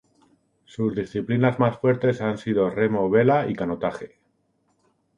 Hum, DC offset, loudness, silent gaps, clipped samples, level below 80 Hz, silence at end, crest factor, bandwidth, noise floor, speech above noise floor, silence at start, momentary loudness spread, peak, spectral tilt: none; under 0.1%; -23 LUFS; none; under 0.1%; -58 dBFS; 1.1 s; 18 dB; 10 kHz; -68 dBFS; 46 dB; 0.8 s; 10 LU; -4 dBFS; -8.5 dB/octave